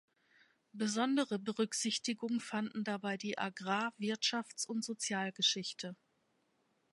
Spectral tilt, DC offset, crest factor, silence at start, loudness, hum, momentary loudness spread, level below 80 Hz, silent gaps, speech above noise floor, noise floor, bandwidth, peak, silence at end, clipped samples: -3 dB/octave; under 0.1%; 20 dB; 0.75 s; -36 LUFS; none; 7 LU; -88 dBFS; none; 41 dB; -78 dBFS; 11.5 kHz; -18 dBFS; 1 s; under 0.1%